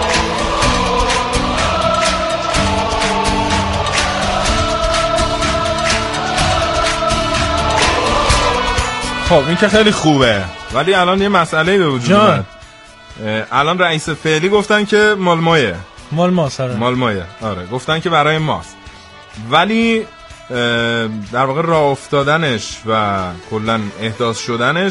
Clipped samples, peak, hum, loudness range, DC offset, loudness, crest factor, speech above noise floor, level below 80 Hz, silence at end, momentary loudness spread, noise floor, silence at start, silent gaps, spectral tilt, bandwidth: under 0.1%; 0 dBFS; none; 4 LU; under 0.1%; -14 LUFS; 14 dB; 24 dB; -28 dBFS; 0 s; 8 LU; -38 dBFS; 0 s; none; -4.5 dB/octave; 11.5 kHz